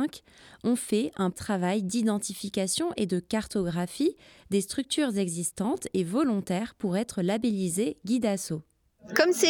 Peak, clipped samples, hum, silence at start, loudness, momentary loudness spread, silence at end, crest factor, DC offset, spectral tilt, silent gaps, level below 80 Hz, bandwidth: -6 dBFS; under 0.1%; none; 0 s; -29 LUFS; 4 LU; 0 s; 22 dB; under 0.1%; -4.5 dB/octave; none; -62 dBFS; 18 kHz